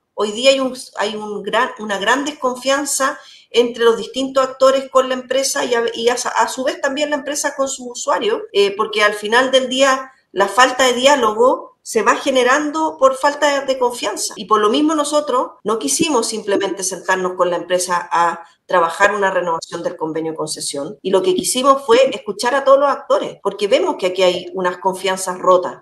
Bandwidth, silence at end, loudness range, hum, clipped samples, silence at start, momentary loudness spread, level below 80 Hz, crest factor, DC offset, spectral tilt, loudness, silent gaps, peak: 12.5 kHz; 0.05 s; 4 LU; none; under 0.1%; 0.15 s; 9 LU; -62 dBFS; 16 dB; under 0.1%; -2 dB/octave; -17 LUFS; none; 0 dBFS